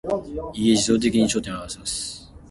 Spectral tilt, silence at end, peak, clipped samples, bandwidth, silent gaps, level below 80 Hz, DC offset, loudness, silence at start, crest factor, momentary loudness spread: -4 dB/octave; 0.05 s; -6 dBFS; under 0.1%; 11.5 kHz; none; -46 dBFS; under 0.1%; -23 LUFS; 0.05 s; 16 dB; 14 LU